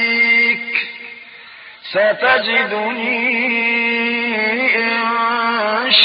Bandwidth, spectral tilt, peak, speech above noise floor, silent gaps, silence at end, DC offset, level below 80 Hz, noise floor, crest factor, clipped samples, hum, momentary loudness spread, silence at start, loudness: 5.4 kHz; -5.5 dB/octave; 0 dBFS; 22 dB; none; 0 s; under 0.1%; -68 dBFS; -38 dBFS; 16 dB; under 0.1%; none; 13 LU; 0 s; -15 LUFS